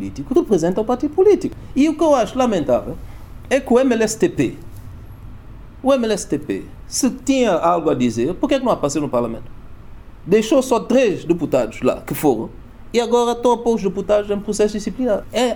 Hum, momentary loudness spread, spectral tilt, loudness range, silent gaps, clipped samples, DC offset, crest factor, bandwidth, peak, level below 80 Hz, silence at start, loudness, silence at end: none; 11 LU; -5 dB/octave; 3 LU; none; under 0.1%; under 0.1%; 16 dB; 19.5 kHz; -2 dBFS; -40 dBFS; 0 s; -18 LUFS; 0 s